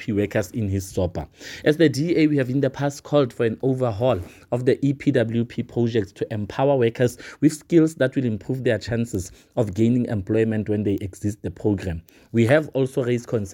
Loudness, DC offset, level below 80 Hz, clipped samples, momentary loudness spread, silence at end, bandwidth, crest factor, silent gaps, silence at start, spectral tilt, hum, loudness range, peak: -22 LUFS; under 0.1%; -50 dBFS; under 0.1%; 9 LU; 0 s; 17 kHz; 18 dB; none; 0 s; -7 dB/octave; none; 2 LU; -4 dBFS